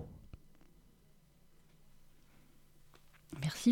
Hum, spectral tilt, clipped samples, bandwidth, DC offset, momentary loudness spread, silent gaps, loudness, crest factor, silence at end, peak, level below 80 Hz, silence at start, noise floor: none; -5.5 dB/octave; under 0.1%; 17.5 kHz; under 0.1%; 27 LU; none; -39 LUFS; 24 dB; 0 s; -18 dBFS; -64 dBFS; 0 s; -65 dBFS